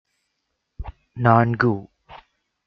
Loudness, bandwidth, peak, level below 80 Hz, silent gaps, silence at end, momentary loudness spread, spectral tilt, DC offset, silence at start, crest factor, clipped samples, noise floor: -19 LUFS; 5.6 kHz; -2 dBFS; -44 dBFS; none; 0.5 s; 22 LU; -10 dB/octave; under 0.1%; 0.8 s; 22 dB; under 0.1%; -76 dBFS